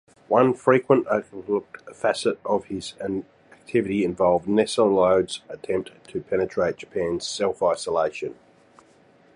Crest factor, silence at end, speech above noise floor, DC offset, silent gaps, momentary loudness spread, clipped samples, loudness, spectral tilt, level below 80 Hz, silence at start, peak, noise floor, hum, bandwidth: 20 dB; 1.05 s; 33 dB; under 0.1%; none; 12 LU; under 0.1%; -23 LUFS; -5.5 dB/octave; -58 dBFS; 0.3 s; -4 dBFS; -56 dBFS; none; 11 kHz